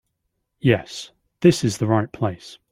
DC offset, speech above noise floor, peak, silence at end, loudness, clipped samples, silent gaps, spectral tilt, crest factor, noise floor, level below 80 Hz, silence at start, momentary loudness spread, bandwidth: under 0.1%; 55 dB; -2 dBFS; 0.2 s; -21 LUFS; under 0.1%; none; -6 dB/octave; 20 dB; -75 dBFS; -54 dBFS; 0.65 s; 17 LU; 14.5 kHz